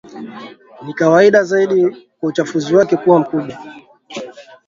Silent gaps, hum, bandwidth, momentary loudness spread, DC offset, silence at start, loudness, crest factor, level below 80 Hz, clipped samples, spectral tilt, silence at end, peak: none; none; 7.6 kHz; 22 LU; under 0.1%; 0.1 s; -14 LUFS; 16 dB; -62 dBFS; under 0.1%; -6 dB/octave; 0.25 s; 0 dBFS